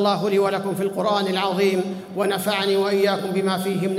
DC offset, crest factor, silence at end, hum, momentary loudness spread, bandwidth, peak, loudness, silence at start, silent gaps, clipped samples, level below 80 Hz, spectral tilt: under 0.1%; 14 dB; 0 s; none; 4 LU; 16 kHz; -6 dBFS; -22 LUFS; 0 s; none; under 0.1%; -66 dBFS; -5 dB/octave